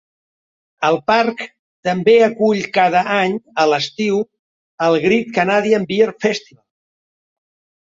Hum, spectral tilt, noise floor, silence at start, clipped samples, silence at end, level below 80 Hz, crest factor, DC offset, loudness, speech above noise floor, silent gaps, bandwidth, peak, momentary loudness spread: none; -5 dB/octave; under -90 dBFS; 0.8 s; under 0.1%; 1.5 s; -62 dBFS; 16 dB; under 0.1%; -16 LUFS; over 74 dB; 1.59-1.83 s, 4.39-4.78 s; 7.8 kHz; -2 dBFS; 9 LU